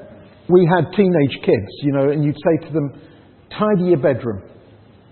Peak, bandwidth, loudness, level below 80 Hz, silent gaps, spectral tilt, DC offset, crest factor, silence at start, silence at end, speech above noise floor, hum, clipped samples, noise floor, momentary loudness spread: -2 dBFS; 4.4 kHz; -17 LUFS; -54 dBFS; none; -13 dB/octave; under 0.1%; 16 dB; 0 s; 0.7 s; 30 dB; none; under 0.1%; -46 dBFS; 13 LU